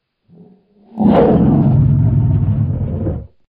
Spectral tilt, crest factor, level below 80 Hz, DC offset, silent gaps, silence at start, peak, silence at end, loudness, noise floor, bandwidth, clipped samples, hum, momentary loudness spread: -12.5 dB/octave; 14 dB; -28 dBFS; under 0.1%; none; 0.95 s; 0 dBFS; 0.3 s; -14 LUFS; -47 dBFS; 4.3 kHz; under 0.1%; none; 12 LU